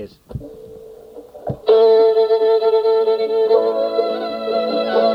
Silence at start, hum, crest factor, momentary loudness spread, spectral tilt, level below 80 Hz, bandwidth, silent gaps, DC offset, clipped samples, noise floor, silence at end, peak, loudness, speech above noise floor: 0 s; none; 14 dB; 21 LU; -7 dB/octave; -50 dBFS; 5.4 kHz; none; under 0.1%; under 0.1%; -38 dBFS; 0 s; -2 dBFS; -16 LUFS; 23 dB